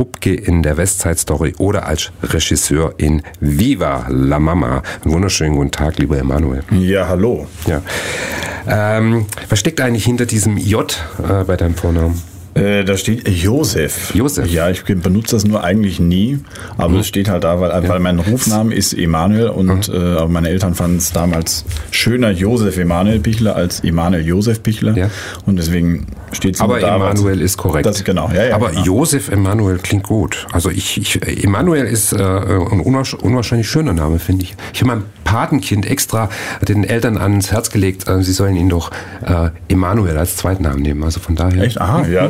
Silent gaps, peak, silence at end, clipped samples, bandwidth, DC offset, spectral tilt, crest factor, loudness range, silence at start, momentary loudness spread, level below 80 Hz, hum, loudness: none; -2 dBFS; 0 s; under 0.1%; 16.5 kHz; 0.3%; -5.5 dB/octave; 12 dB; 2 LU; 0 s; 5 LU; -28 dBFS; none; -15 LUFS